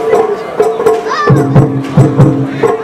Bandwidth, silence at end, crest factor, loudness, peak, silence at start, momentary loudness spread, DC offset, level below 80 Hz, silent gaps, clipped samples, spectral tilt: 12.5 kHz; 0 s; 10 dB; -10 LUFS; 0 dBFS; 0 s; 5 LU; under 0.1%; -36 dBFS; none; 1%; -8 dB/octave